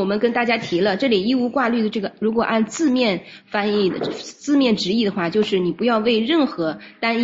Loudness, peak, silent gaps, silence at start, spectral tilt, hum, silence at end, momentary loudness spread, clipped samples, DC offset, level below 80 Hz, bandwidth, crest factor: -20 LUFS; -4 dBFS; none; 0 s; -5 dB/octave; none; 0 s; 7 LU; under 0.1%; under 0.1%; -60 dBFS; 7.8 kHz; 16 dB